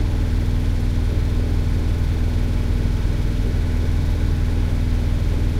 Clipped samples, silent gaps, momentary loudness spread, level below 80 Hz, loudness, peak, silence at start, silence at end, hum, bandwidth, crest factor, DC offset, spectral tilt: under 0.1%; none; 1 LU; -20 dBFS; -22 LUFS; -8 dBFS; 0 s; 0 s; none; 12.5 kHz; 10 dB; under 0.1%; -7.5 dB/octave